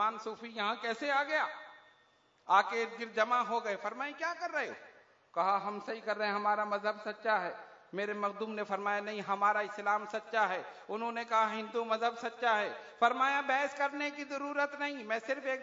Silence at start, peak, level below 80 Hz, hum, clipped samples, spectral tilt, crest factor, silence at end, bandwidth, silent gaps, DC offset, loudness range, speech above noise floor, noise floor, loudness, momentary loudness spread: 0 s; -14 dBFS; -88 dBFS; none; under 0.1%; -1 dB/octave; 20 dB; 0 s; 7.4 kHz; none; under 0.1%; 3 LU; 35 dB; -69 dBFS; -34 LUFS; 9 LU